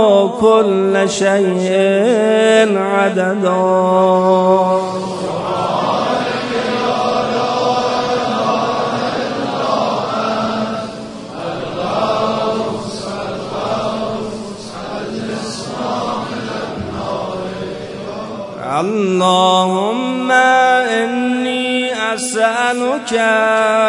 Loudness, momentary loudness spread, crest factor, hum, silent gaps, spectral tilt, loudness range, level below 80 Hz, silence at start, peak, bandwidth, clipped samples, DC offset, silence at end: -16 LUFS; 12 LU; 16 dB; none; none; -4.5 dB/octave; 9 LU; -52 dBFS; 0 s; 0 dBFS; 11 kHz; under 0.1%; under 0.1%; 0 s